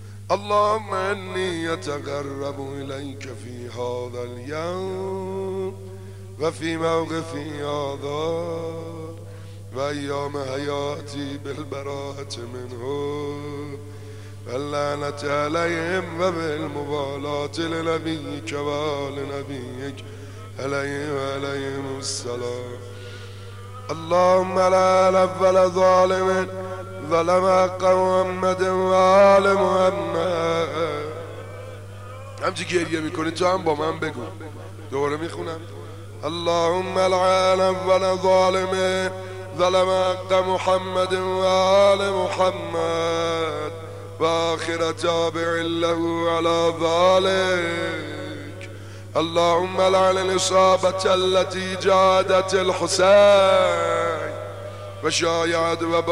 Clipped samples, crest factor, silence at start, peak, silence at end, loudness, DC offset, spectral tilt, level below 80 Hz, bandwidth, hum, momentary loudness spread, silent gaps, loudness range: under 0.1%; 16 dB; 0 s; -6 dBFS; 0 s; -21 LUFS; 0.4%; -4.5 dB/octave; -58 dBFS; 12.5 kHz; 50 Hz at -40 dBFS; 18 LU; none; 11 LU